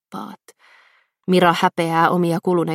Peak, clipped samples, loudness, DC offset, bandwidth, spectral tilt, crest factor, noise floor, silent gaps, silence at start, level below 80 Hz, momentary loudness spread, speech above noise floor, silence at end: 0 dBFS; under 0.1%; -17 LUFS; under 0.1%; 15 kHz; -6 dB/octave; 20 dB; -57 dBFS; none; 0.1 s; -66 dBFS; 18 LU; 40 dB; 0 s